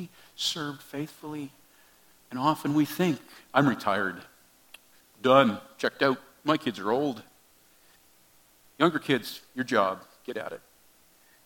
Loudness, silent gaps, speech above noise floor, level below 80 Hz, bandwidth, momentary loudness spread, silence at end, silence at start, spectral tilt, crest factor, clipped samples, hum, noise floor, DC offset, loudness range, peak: -28 LUFS; none; 33 dB; -74 dBFS; 17.5 kHz; 15 LU; 0.9 s; 0 s; -5 dB/octave; 26 dB; under 0.1%; none; -61 dBFS; under 0.1%; 4 LU; -4 dBFS